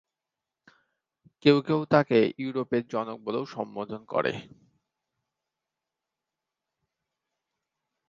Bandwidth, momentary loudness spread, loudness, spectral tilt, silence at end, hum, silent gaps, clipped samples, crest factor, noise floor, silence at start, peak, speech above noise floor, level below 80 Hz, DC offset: 7.4 kHz; 13 LU; -27 LUFS; -7.5 dB/octave; 3.65 s; none; none; under 0.1%; 26 dB; -88 dBFS; 1.45 s; -4 dBFS; 62 dB; -70 dBFS; under 0.1%